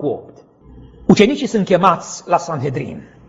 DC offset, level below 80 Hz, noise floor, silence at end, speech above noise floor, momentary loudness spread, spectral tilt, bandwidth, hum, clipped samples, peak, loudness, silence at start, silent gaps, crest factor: under 0.1%; -48 dBFS; -42 dBFS; 0.25 s; 25 dB; 13 LU; -6 dB/octave; 8 kHz; none; 0.1%; 0 dBFS; -16 LUFS; 0 s; none; 18 dB